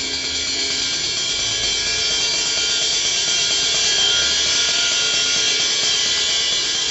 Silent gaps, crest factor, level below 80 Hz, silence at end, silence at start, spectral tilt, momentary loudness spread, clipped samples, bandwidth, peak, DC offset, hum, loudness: none; 12 dB; -46 dBFS; 0 s; 0 s; 1 dB/octave; 4 LU; under 0.1%; 12 kHz; -8 dBFS; under 0.1%; none; -16 LUFS